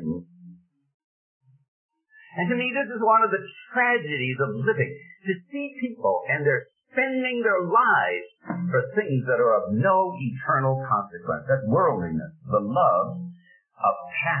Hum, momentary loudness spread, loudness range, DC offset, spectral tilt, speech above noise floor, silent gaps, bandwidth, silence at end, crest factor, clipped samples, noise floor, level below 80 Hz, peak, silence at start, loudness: none; 11 LU; 3 LU; under 0.1%; -11 dB/octave; 26 dB; 0.94-1.41 s, 1.68-1.89 s; 3.3 kHz; 0 s; 16 dB; under 0.1%; -50 dBFS; -64 dBFS; -8 dBFS; 0 s; -24 LUFS